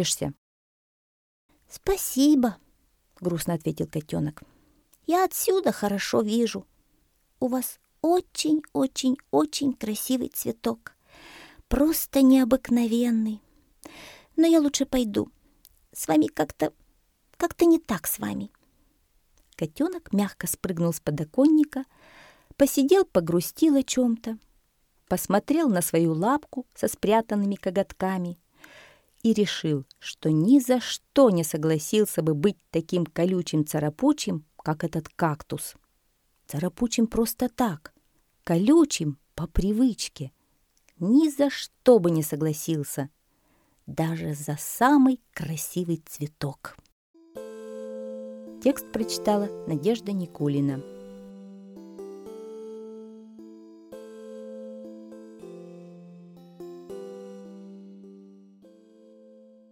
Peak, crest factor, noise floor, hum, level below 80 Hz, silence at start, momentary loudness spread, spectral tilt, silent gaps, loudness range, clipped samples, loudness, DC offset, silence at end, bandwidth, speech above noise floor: -6 dBFS; 20 dB; -69 dBFS; none; -50 dBFS; 0 s; 22 LU; -5.5 dB/octave; 0.38-1.49 s, 46.92-47.14 s; 19 LU; under 0.1%; -25 LUFS; under 0.1%; 1.5 s; 19 kHz; 45 dB